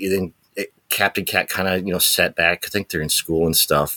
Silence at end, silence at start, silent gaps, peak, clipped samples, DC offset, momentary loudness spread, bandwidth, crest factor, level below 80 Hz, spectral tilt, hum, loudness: 0 s; 0 s; none; 0 dBFS; under 0.1%; under 0.1%; 11 LU; 19 kHz; 20 dB; -50 dBFS; -2.5 dB/octave; none; -19 LUFS